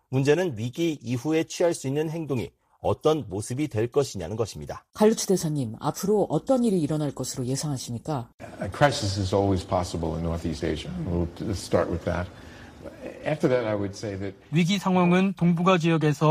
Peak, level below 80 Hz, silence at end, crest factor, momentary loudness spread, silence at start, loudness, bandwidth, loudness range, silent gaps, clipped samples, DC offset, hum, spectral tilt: -6 dBFS; -48 dBFS; 0 s; 20 dB; 11 LU; 0.1 s; -26 LUFS; 15.5 kHz; 4 LU; 8.34-8.38 s; under 0.1%; under 0.1%; none; -6 dB/octave